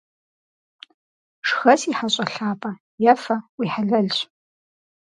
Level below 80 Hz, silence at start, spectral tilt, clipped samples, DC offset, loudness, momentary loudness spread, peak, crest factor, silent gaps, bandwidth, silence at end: -74 dBFS; 1.45 s; -4.5 dB/octave; under 0.1%; under 0.1%; -21 LUFS; 10 LU; -2 dBFS; 22 dB; 2.80-2.98 s, 3.49-3.58 s; 11 kHz; 0.8 s